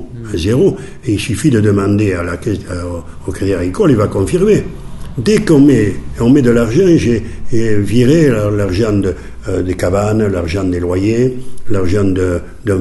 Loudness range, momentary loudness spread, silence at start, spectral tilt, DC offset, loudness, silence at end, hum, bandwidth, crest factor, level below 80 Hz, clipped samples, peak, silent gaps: 4 LU; 11 LU; 0 s; -7 dB/octave; under 0.1%; -13 LUFS; 0 s; none; 12 kHz; 12 dB; -30 dBFS; under 0.1%; 0 dBFS; none